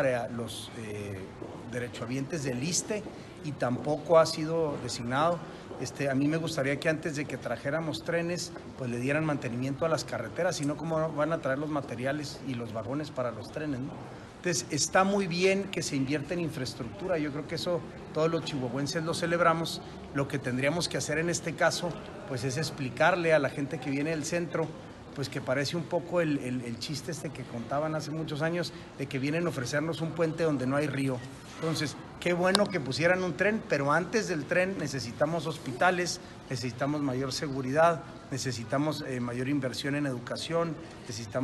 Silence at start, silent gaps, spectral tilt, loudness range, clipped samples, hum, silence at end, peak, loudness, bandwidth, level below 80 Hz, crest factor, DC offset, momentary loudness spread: 0 s; none; -5 dB/octave; 4 LU; under 0.1%; none; 0 s; 0 dBFS; -31 LUFS; 12.5 kHz; -60 dBFS; 30 dB; under 0.1%; 11 LU